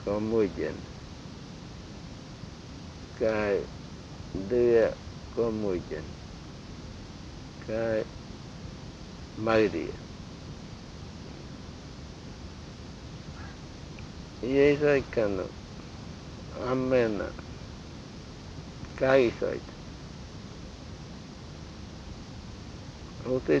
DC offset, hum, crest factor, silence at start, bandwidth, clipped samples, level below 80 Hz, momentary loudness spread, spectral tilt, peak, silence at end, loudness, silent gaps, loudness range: under 0.1%; none; 22 dB; 0 s; 8.4 kHz; under 0.1%; -50 dBFS; 19 LU; -6.5 dB/octave; -10 dBFS; 0 s; -29 LUFS; none; 14 LU